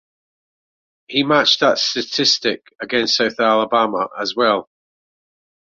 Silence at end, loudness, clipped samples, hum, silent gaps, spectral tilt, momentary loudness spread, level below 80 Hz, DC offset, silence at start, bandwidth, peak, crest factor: 1.15 s; -17 LUFS; under 0.1%; none; none; -2.5 dB/octave; 8 LU; -64 dBFS; under 0.1%; 1.1 s; 7.6 kHz; -2 dBFS; 18 dB